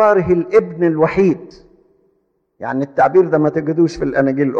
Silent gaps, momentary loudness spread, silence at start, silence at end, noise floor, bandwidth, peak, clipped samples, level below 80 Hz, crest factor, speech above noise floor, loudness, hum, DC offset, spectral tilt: none; 9 LU; 0 s; 0 s; -64 dBFS; 7.6 kHz; -2 dBFS; under 0.1%; -46 dBFS; 14 dB; 50 dB; -15 LUFS; none; under 0.1%; -8.5 dB/octave